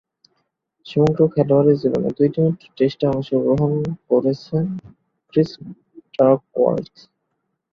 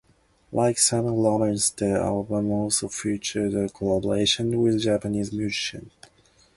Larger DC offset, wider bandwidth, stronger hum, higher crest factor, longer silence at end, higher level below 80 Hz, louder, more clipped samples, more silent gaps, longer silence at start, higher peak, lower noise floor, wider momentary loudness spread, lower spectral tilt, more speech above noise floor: neither; second, 7.2 kHz vs 11.5 kHz; neither; about the same, 18 dB vs 18 dB; first, 0.9 s vs 0.7 s; about the same, -54 dBFS vs -52 dBFS; first, -19 LUFS vs -24 LUFS; neither; neither; first, 0.85 s vs 0.5 s; first, -2 dBFS vs -6 dBFS; first, -74 dBFS vs -59 dBFS; first, 11 LU vs 7 LU; first, -9.5 dB/octave vs -4 dB/octave; first, 56 dB vs 35 dB